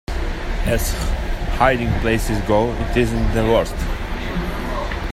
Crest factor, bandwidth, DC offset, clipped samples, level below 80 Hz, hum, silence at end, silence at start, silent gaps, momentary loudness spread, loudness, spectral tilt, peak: 18 dB; 16 kHz; under 0.1%; under 0.1%; -24 dBFS; none; 0 s; 0.1 s; none; 9 LU; -21 LUFS; -5.5 dB/octave; -2 dBFS